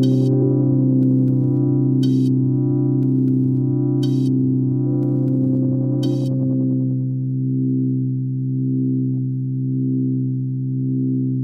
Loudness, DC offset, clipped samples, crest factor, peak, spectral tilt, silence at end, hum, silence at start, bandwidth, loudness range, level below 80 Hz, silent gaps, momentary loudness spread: -19 LUFS; under 0.1%; under 0.1%; 12 dB; -6 dBFS; -11 dB/octave; 0 s; none; 0 s; 5.8 kHz; 4 LU; -74 dBFS; none; 6 LU